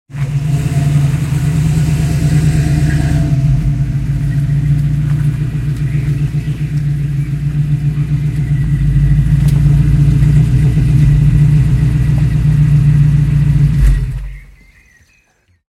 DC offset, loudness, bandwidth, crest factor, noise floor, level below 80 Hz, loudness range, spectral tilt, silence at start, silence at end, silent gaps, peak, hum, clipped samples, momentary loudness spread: under 0.1%; -13 LUFS; 12 kHz; 12 dB; -55 dBFS; -20 dBFS; 5 LU; -8 dB/octave; 0.1 s; 1.25 s; none; 0 dBFS; none; under 0.1%; 7 LU